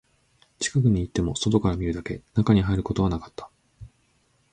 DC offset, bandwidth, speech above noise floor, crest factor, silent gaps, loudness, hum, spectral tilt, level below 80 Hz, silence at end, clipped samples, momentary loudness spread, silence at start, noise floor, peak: under 0.1%; 9.6 kHz; 42 dB; 18 dB; none; -24 LUFS; none; -6 dB/octave; -40 dBFS; 0.65 s; under 0.1%; 11 LU; 0.6 s; -66 dBFS; -6 dBFS